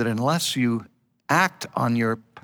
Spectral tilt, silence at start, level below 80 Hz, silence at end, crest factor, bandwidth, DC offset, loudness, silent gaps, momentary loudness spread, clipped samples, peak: -4.5 dB/octave; 0 s; -70 dBFS; 0.05 s; 18 dB; over 20 kHz; under 0.1%; -23 LUFS; none; 5 LU; under 0.1%; -6 dBFS